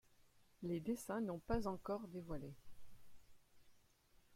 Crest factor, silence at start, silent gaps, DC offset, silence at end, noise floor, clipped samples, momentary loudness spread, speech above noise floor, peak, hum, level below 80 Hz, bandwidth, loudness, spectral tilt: 22 dB; 0.2 s; none; under 0.1%; 0 s; -72 dBFS; under 0.1%; 9 LU; 28 dB; -26 dBFS; none; -60 dBFS; 16.5 kHz; -45 LUFS; -6.5 dB/octave